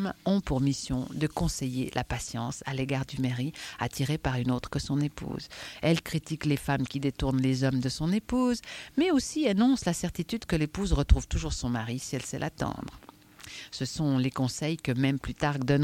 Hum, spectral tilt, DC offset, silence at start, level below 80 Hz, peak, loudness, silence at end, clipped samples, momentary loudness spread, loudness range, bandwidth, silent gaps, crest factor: none; -5.5 dB/octave; under 0.1%; 0 s; -40 dBFS; -8 dBFS; -30 LUFS; 0 s; under 0.1%; 8 LU; 4 LU; 16.5 kHz; none; 22 dB